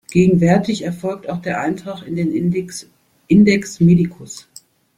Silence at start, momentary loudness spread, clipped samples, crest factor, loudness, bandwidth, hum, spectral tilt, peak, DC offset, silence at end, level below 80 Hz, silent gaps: 0.1 s; 18 LU; under 0.1%; 14 dB; -17 LUFS; 11.5 kHz; none; -7 dB/octave; -2 dBFS; under 0.1%; 0.6 s; -48 dBFS; none